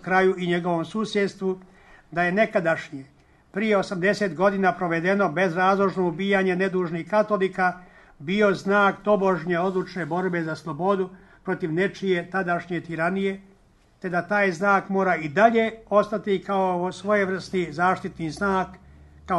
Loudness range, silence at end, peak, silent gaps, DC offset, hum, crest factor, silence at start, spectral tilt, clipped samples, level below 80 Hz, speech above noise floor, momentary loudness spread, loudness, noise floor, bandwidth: 4 LU; 0 s; -4 dBFS; none; under 0.1%; none; 20 dB; 0.05 s; -6.5 dB/octave; under 0.1%; -58 dBFS; 34 dB; 9 LU; -23 LUFS; -57 dBFS; 11.5 kHz